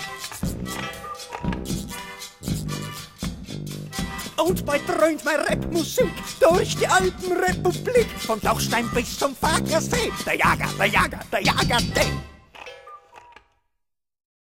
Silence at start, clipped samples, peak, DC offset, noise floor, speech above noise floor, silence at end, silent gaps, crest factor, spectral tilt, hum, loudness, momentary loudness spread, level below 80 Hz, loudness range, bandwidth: 0 s; under 0.1%; -4 dBFS; under 0.1%; -81 dBFS; 59 dB; 1.15 s; none; 20 dB; -4 dB/octave; none; -23 LUFS; 14 LU; -40 dBFS; 9 LU; 16.5 kHz